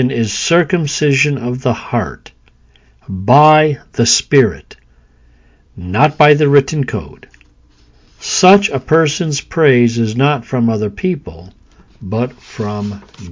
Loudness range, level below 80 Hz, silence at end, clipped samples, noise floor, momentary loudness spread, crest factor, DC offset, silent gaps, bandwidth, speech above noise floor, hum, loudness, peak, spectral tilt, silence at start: 3 LU; -42 dBFS; 0 s; under 0.1%; -48 dBFS; 16 LU; 14 dB; under 0.1%; none; 7.6 kHz; 35 dB; none; -13 LUFS; 0 dBFS; -5 dB/octave; 0 s